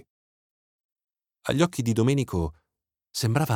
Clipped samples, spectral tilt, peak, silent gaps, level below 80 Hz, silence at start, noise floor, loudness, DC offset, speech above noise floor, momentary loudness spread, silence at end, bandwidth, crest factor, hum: under 0.1%; -6 dB/octave; -10 dBFS; none; -48 dBFS; 1.45 s; -86 dBFS; -26 LUFS; under 0.1%; 62 dB; 11 LU; 0 s; 17.5 kHz; 18 dB; none